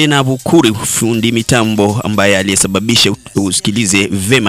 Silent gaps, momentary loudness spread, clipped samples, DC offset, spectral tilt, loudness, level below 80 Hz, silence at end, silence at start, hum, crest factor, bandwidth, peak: none; 3 LU; under 0.1%; under 0.1%; -3.5 dB/octave; -11 LUFS; -42 dBFS; 0 s; 0 s; none; 12 dB; 16.5 kHz; 0 dBFS